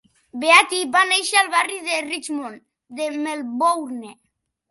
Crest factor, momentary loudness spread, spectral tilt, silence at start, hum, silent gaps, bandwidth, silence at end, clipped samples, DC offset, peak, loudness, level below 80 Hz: 20 dB; 19 LU; 0 dB/octave; 0.35 s; none; none; 12 kHz; 0.6 s; under 0.1%; under 0.1%; 0 dBFS; -19 LUFS; -74 dBFS